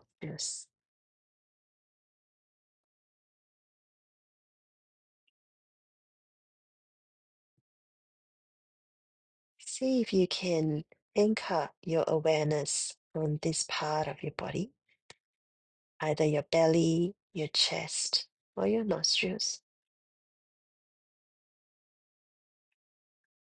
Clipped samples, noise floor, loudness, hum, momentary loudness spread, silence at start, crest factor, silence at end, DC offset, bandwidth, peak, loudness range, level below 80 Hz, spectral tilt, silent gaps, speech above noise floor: under 0.1%; under -90 dBFS; -31 LUFS; none; 11 LU; 0.2 s; 22 dB; 3.9 s; under 0.1%; 10 kHz; -14 dBFS; 9 LU; -70 dBFS; -4 dB/octave; 0.85-9.57 s, 11.02-11.11 s, 11.77-11.82 s, 12.97-13.11 s, 15.02-15.09 s, 15.20-16.00 s, 17.22-17.30 s, 18.32-18.53 s; over 60 dB